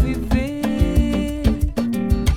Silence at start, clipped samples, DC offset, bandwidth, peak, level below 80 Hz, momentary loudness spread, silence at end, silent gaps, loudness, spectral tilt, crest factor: 0 s; under 0.1%; under 0.1%; 16.5 kHz; -4 dBFS; -22 dBFS; 3 LU; 0 s; none; -21 LUFS; -7 dB/octave; 14 dB